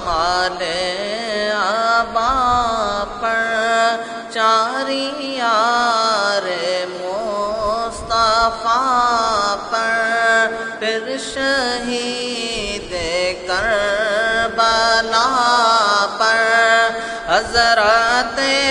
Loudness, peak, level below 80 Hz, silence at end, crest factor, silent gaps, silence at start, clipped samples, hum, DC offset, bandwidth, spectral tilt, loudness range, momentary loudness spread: -17 LUFS; 0 dBFS; -42 dBFS; 0 s; 16 dB; none; 0 s; under 0.1%; none; under 0.1%; 11 kHz; -2 dB/octave; 4 LU; 8 LU